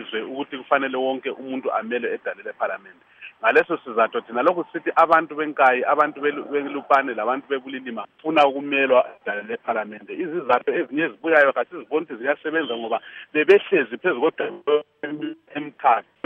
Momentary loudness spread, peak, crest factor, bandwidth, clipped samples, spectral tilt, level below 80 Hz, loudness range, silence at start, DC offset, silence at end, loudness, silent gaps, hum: 13 LU; -4 dBFS; 18 dB; 7.6 kHz; under 0.1%; -6 dB/octave; -74 dBFS; 4 LU; 0 s; under 0.1%; 0.25 s; -22 LUFS; none; none